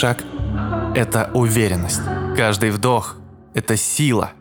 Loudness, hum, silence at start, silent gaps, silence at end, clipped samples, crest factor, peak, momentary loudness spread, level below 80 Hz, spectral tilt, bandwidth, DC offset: -19 LUFS; none; 0 s; none; 0.1 s; under 0.1%; 18 dB; -2 dBFS; 8 LU; -38 dBFS; -4.5 dB/octave; over 20 kHz; under 0.1%